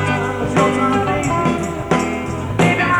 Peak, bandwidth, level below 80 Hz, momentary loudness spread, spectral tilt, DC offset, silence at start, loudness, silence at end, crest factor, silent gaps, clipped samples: 0 dBFS; 18 kHz; -38 dBFS; 7 LU; -6 dB/octave; under 0.1%; 0 s; -18 LUFS; 0 s; 16 dB; none; under 0.1%